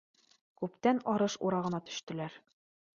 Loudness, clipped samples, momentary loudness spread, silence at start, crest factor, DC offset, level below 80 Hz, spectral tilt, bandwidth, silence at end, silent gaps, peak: -34 LUFS; under 0.1%; 11 LU; 0.6 s; 20 dB; under 0.1%; -76 dBFS; -5.5 dB/octave; 7.6 kHz; 0.6 s; 2.03-2.07 s; -14 dBFS